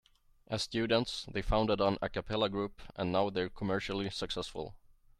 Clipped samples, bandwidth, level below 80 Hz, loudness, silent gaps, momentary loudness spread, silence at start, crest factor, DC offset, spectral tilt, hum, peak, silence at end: under 0.1%; 13 kHz; -48 dBFS; -34 LUFS; none; 9 LU; 0.5 s; 18 dB; under 0.1%; -5.5 dB/octave; none; -16 dBFS; 0.45 s